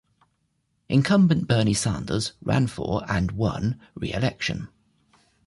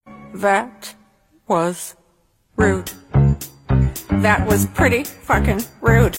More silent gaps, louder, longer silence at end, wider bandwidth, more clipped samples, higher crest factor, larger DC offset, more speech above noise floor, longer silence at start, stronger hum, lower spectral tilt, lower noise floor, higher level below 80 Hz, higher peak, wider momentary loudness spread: neither; second, -24 LUFS vs -18 LUFS; first, 0.8 s vs 0 s; second, 11.5 kHz vs 16.5 kHz; neither; about the same, 16 dB vs 16 dB; neither; first, 49 dB vs 43 dB; first, 0.9 s vs 0.05 s; neither; about the same, -5.5 dB/octave vs -6 dB/octave; first, -72 dBFS vs -61 dBFS; second, -44 dBFS vs -28 dBFS; second, -8 dBFS vs -2 dBFS; second, 10 LU vs 15 LU